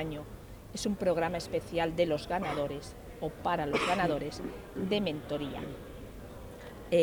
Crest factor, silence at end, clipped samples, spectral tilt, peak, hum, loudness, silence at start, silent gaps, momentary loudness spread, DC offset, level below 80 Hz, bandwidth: 18 dB; 0 s; under 0.1%; -5.5 dB/octave; -14 dBFS; none; -33 LUFS; 0 s; none; 17 LU; under 0.1%; -52 dBFS; over 20 kHz